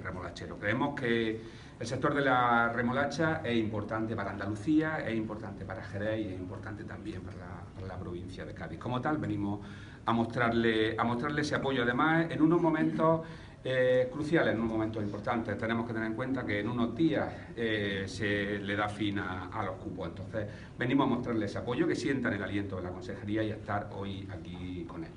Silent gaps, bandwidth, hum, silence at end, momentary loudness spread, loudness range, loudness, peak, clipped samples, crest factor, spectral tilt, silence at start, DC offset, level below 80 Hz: none; 10.5 kHz; none; 0 s; 14 LU; 9 LU; -32 LUFS; -14 dBFS; under 0.1%; 18 dB; -6.5 dB/octave; 0 s; under 0.1%; -56 dBFS